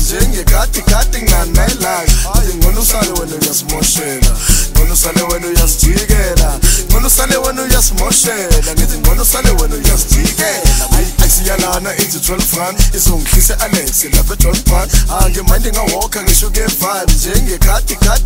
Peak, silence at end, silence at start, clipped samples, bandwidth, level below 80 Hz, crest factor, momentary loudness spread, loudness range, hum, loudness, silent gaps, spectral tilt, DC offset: 0 dBFS; 0 s; 0 s; 0.2%; 16.5 kHz; -12 dBFS; 10 dB; 4 LU; 2 LU; none; -12 LUFS; none; -3 dB/octave; 0.5%